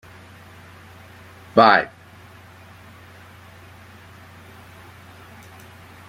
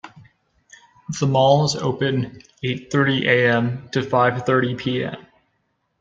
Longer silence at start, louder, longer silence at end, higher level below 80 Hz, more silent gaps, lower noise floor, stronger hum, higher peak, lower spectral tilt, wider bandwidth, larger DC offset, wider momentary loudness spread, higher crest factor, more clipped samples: first, 1.55 s vs 0.05 s; first, -16 LUFS vs -20 LUFS; first, 4.25 s vs 0.8 s; second, -62 dBFS vs -56 dBFS; neither; second, -45 dBFS vs -70 dBFS; neither; about the same, -2 dBFS vs -2 dBFS; about the same, -5.5 dB/octave vs -5.5 dB/octave; first, 16.5 kHz vs 7.8 kHz; neither; first, 29 LU vs 13 LU; first, 24 dB vs 18 dB; neither